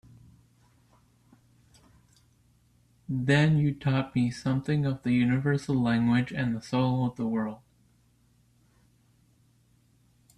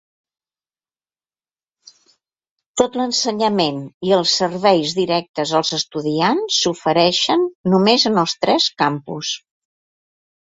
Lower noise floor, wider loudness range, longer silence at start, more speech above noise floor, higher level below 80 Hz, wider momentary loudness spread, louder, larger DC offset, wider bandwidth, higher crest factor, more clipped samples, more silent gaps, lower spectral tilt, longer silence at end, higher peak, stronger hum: second, -65 dBFS vs under -90 dBFS; about the same, 8 LU vs 6 LU; first, 3.1 s vs 2.75 s; second, 39 dB vs over 72 dB; about the same, -60 dBFS vs -60 dBFS; about the same, 8 LU vs 7 LU; second, -27 LUFS vs -17 LUFS; neither; first, 10.5 kHz vs 8 kHz; about the same, 18 dB vs 18 dB; neither; second, none vs 3.94-4.01 s, 5.29-5.34 s, 7.55-7.64 s; first, -7.5 dB/octave vs -4 dB/octave; first, 2.8 s vs 1.1 s; second, -12 dBFS vs 0 dBFS; neither